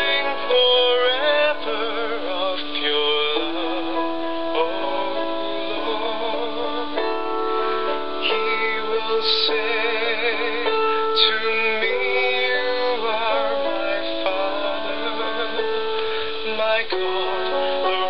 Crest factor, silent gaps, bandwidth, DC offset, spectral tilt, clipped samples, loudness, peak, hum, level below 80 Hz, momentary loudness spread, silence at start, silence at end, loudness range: 18 dB; none; 5.8 kHz; 4%; -5 dB/octave; under 0.1%; -21 LUFS; -4 dBFS; none; -58 dBFS; 7 LU; 0 s; 0 s; 5 LU